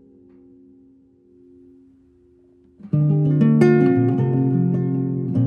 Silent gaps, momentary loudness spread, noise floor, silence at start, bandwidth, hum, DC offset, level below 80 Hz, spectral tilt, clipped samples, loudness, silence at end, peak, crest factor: none; 8 LU; -54 dBFS; 2.85 s; 6.6 kHz; none; under 0.1%; -62 dBFS; -10.5 dB/octave; under 0.1%; -18 LUFS; 0 s; -2 dBFS; 18 dB